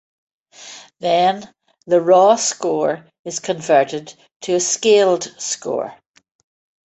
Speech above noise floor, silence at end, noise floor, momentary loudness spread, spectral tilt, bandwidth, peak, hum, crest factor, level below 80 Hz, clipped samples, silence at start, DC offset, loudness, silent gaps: 23 dB; 0.95 s; -40 dBFS; 17 LU; -3 dB/octave; 8.2 kHz; -2 dBFS; none; 18 dB; -68 dBFS; under 0.1%; 0.6 s; under 0.1%; -17 LUFS; 3.19-3.24 s, 4.36-4.40 s